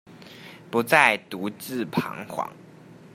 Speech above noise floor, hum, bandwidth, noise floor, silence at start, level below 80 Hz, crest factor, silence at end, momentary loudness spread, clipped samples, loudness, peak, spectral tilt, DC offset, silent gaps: 23 dB; none; 16 kHz; -48 dBFS; 0.1 s; -72 dBFS; 26 dB; 0.2 s; 23 LU; under 0.1%; -24 LUFS; -2 dBFS; -4.5 dB/octave; under 0.1%; none